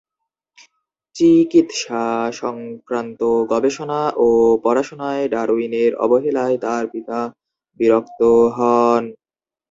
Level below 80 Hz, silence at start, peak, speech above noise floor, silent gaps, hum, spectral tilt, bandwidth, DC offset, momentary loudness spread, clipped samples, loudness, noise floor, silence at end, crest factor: -56 dBFS; 1.15 s; -2 dBFS; over 73 dB; none; none; -5.5 dB/octave; 7.8 kHz; under 0.1%; 11 LU; under 0.1%; -17 LUFS; under -90 dBFS; 0.6 s; 16 dB